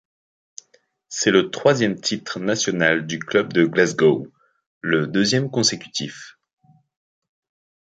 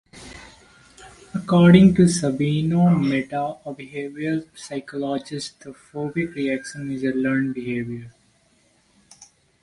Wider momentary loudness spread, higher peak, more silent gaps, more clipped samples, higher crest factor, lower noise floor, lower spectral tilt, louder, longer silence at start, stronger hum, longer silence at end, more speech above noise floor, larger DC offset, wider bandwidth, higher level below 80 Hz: second, 11 LU vs 19 LU; about the same, -2 dBFS vs 0 dBFS; first, 4.66-4.81 s vs none; neither; about the same, 20 dB vs 22 dB; about the same, -61 dBFS vs -61 dBFS; second, -4 dB/octave vs -6.5 dB/octave; about the same, -20 LUFS vs -21 LUFS; first, 1.1 s vs 0.15 s; neither; about the same, 1.55 s vs 1.55 s; about the same, 41 dB vs 41 dB; neither; second, 9.4 kHz vs 11.5 kHz; second, -64 dBFS vs -50 dBFS